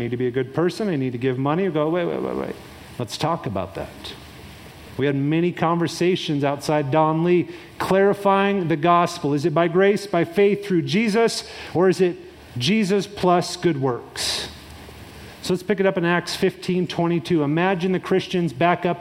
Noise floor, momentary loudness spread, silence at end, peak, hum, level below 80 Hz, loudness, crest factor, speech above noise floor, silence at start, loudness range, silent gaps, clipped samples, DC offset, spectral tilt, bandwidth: -41 dBFS; 15 LU; 0 s; -4 dBFS; none; -54 dBFS; -21 LUFS; 18 dB; 20 dB; 0 s; 6 LU; none; under 0.1%; under 0.1%; -6 dB/octave; 16 kHz